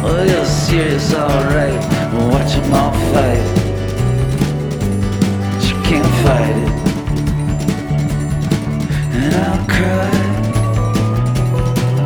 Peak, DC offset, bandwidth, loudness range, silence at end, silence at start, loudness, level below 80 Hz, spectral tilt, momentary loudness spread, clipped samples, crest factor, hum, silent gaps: -2 dBFS; under 0.1%; over 20 kHz; 2 LU; 0 s; 0 s; -15 LUFS; -26 dBFS; -6.5 dB/octave; 4 LU; under 0.1%; 12 dB; none; none